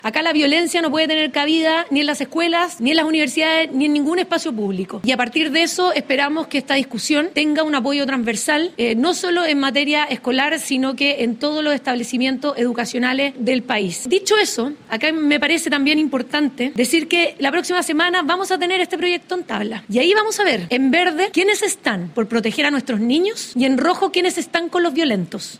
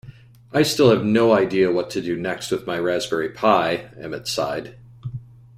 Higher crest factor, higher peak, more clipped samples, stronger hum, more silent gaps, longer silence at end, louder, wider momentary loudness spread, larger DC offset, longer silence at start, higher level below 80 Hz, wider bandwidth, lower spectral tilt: about the same, 18 dB vs 18 dB; about the same, 0 dBFS vs -2 dBFS; neither; neither; neither; second, 0.05 s vs 0.35 s; about the same, -18 LUFS vs -20 LUFS; second, 5 LU vs 18 LU; neither; about the same, 0.05 s vs 0.05 s; second, -64 dBFS vs -56 dBFS; about the same, 16 kHz vs 16 kHz; second, -3 dB/octave vs -5 dB/octave